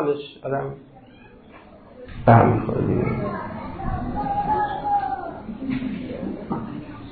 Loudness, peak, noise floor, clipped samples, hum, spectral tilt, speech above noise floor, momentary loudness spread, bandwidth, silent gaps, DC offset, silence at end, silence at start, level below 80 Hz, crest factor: -24 LUFS; -2 dBFS; -47 dBFS; under 0.1%; none; -12 dB/octave; 27 dB; 18 LU; 4.7 kHz; none; under 0.1%; 0 s; 0 s; -40 dBFS; 22 dB